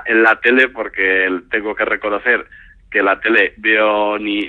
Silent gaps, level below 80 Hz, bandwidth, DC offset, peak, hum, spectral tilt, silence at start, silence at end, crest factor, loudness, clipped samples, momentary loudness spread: none; -50 dBFS; 7.6 kHz; under 0.1%; 0 dBFS; none; -5.5 dB/octave; 0 s; 0 s; 16 dB; -15 LUFS; under 0.1%; 7 LU